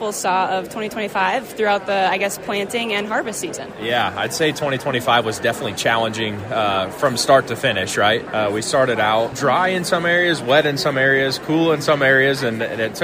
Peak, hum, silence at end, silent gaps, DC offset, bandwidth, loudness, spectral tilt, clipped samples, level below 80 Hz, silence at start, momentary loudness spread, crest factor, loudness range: -2 dBFS; none; 0 s; none; under 0.1%; 16 kHz; -18 LUFS; -3.5 dB/octave; under 0.1%; -54 dBFS; 0 s; 7 LU; 18 dB; 4 LU